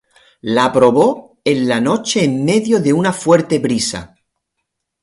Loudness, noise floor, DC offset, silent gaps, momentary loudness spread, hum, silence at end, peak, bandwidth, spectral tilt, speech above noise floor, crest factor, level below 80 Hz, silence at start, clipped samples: -15 LUFS; -75 dBFS; under 0.1%; none; 8 LU; none; 0.95 s; 0 dBFS; 11.5 kHz; -5 dB/octave; 61 dB; 16 dB; -52 dBFS; 0.45 s; under 0.1%